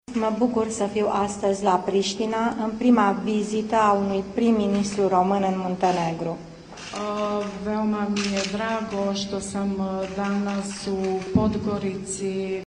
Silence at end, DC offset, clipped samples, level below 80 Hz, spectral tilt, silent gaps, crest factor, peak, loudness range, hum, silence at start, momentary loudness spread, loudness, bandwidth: 0 s; under 0.1%; under 0.1%; -52 dBFS; -5.5 dB/octave; none; 18 dB; -6 dBFS; 5 LU; none; 0.1 s; 8 LU; -24 LUFS; 10.5 kHz